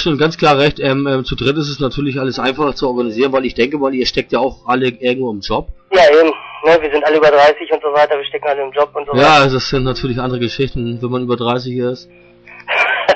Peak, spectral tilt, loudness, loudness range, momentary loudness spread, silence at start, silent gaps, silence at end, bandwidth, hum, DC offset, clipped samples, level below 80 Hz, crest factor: -2 dBFS; -5.5 dB/octave; -14 LUFS; 4 LU; 10 LU; 0 s; none; 0 s; 8.4 kHz; none; under 0.1%; under 0.1%; -36 dBFS; 12 dB